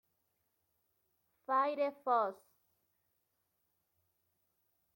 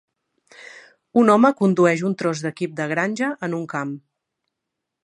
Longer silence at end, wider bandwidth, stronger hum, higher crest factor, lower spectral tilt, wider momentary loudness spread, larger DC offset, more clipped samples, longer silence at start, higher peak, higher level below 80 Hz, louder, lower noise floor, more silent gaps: first, 2.6 s vs 1.05 s; first, 16.5 kHz vs 11 kHz; neither; about the same, 20 dB vs 20 dB; about the same, -5.5 dB/octave vs -6.5 dB/octave; second, 7 LU vs 13 LU; neither; neither; first, 1.5 s vs 0.6 s; second, -20 dBFS vs -2 dBFS; second, under -90 dBFS vs -72 dBFS; second, -35 LUFS vs -20 LUFS; about the same, -82 dBFS vs -82 dBFS; neither